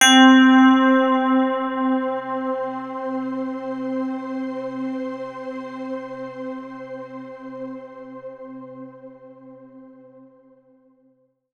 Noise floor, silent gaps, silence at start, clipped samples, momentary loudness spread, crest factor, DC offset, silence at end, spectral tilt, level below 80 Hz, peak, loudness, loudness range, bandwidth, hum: -62 dBFS; none; 0 s; under 0.1%; 24 LU; 20 dB; under 0.1%; 1.65 s; -2 dB/octave; -74 dBFS; -2 dBFS; -20 LUFS; 21 LU; 13.5 kHz; none